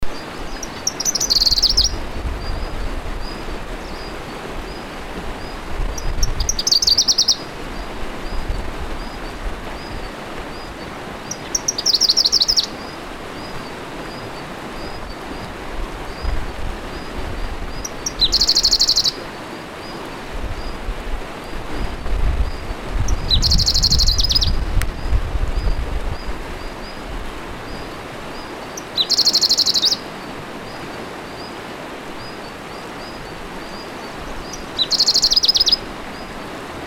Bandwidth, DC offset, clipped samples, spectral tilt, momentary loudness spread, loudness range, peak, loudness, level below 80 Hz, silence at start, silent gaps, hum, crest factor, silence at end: 17.5 kHz; under 0.1%; under 0.1%; -2 dB/octave; 18 LU; 12 LU; 0 dBFS; -18 LUFS; -26 dBFS; 0 s; none; none; 20 dB; 0 s